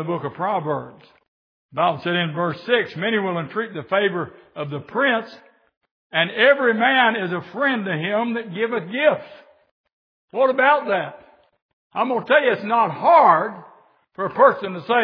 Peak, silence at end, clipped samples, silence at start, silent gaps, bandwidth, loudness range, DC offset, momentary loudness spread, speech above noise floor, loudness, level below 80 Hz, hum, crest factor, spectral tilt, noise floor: -2 dBFS; 0 s; under 0.1%; 0 s; 1.28-1.69 s, 5.77-5.81 s, 5.91-6.10 s, 9.71-9.84 s, 9.93-10.28 s, 11.62-11.90 s; 5.4 kHz; 5 LU; under 0.1%; 13 LU; 33 dB; -20 LUFS; -74 dBFS; none; 20 dB; -8 dB/octave; -53 dBFS